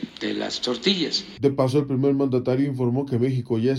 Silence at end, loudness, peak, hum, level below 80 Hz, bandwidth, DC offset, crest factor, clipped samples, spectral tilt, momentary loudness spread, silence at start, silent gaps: 0 s; -23 LUFS; -6 dBFS; none; -58 dBFS; 12 kHz; under 0.1%; 16 dB; under 0.1%; -6 dB/octave; 5 LU; 0 s; none